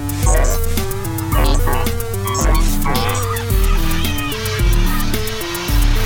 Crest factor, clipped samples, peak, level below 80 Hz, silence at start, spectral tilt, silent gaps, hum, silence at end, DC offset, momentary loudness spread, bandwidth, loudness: 12 dB; under 0.1%; -2 dBFS; -18 dBFS; 0 s; -4.5 dB/octave; none; none; 0 s; under 0.1%; 5 LU; 17 kHz; -18 LUFS